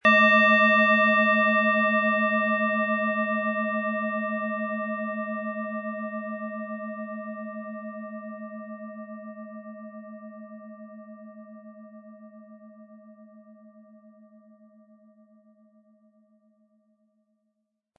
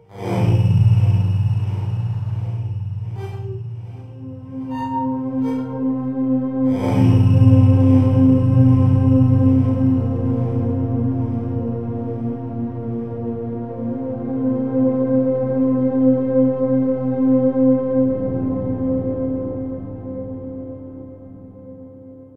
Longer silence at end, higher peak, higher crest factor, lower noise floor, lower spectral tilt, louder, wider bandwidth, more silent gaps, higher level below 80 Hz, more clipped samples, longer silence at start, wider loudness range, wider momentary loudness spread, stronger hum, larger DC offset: first, 4.2 s vs 0 s; second, -6 dBFS vs -2 dBFS; first, 22 dB vs 16 dB; first, -79 dBFS vs -40 dBFS; second, -6.5 dB/octave vs -11 dB/octave; second, -23 LUFS vs -19 LUFS; about the same, 6.6 kHz vs 6 kHz; neither; second, -88 dBFS vs -46 dBFS; neither; about the same, 0.05 s vs 0 s; first, 25 LU vs 12 LU; first, 26 LU vs 16 LU; neither; second, under 0.1% vs 0.7%